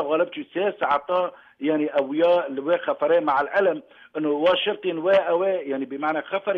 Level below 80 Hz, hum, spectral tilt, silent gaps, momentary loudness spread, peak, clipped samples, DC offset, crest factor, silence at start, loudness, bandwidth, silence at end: -70 dBFS; none; -6.5 dB/octave; none; 7 LU; -10 dBFS; under 0.1%; under 0.1%; 12 dB; 0 s; -23 LUFS; 5.4 kHz; 0 s